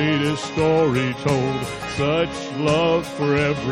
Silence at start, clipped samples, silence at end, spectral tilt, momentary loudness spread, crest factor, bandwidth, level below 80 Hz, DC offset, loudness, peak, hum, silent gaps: 0 s; under 0.1%; 0 s; -6 dB/octave; 6 LU; 14 dB; 15 kHz; -44 dBFS; under 0.1%; -21 LUFS; -6 dBFS; none; none